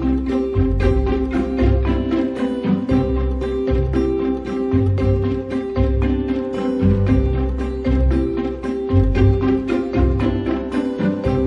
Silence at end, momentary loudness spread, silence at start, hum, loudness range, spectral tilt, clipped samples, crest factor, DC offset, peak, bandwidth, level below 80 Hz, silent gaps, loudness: 0 s; 5 LU; 0 s; none; 1 LU; -9.5 dB/octave; under 0.1%; 16 dB; under 0.1%; -2 dBFS; 6.4 kHz; -24 dBFS; none; -19 LUFS